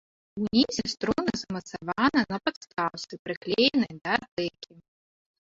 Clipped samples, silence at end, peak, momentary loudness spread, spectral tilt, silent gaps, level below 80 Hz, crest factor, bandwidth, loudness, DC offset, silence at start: under 0.1%; 0.8 s; -8 dBFS; 12 LU; -4 dB/octave; 2.57-2.61 s, 3.19-3.25 s, 3.37-3.41 s, 4.28-4.37 s; -60 dBFS; 20 dB; 7.8 kHz; -28 LUFS; under 0.1%; 0.35 s